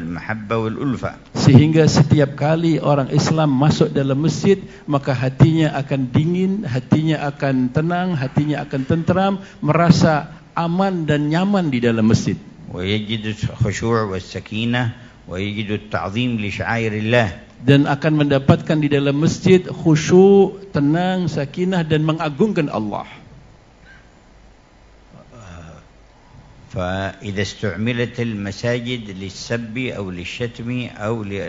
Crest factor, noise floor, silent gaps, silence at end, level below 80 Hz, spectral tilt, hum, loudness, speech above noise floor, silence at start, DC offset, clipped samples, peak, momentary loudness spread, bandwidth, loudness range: 18 dB; -48 dBFS; none; 0 s; -46 dBFS; -6.5 dB/octave; none; -18 LUFS; 30 dB; 0 s; under 0.1%; under 0.1%; 0 dBFS; 12 LU; 7.8 kHz; 9 LU